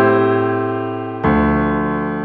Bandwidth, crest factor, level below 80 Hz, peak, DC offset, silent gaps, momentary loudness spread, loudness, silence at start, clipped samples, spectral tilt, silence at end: 4.7 kHz; 14 dB; -34 dBFS; -2 dBFS; under 0.1%; none; 7 LU; -17 LUFS; 0 s; under 0.1%; -11 dB/octave; 0 s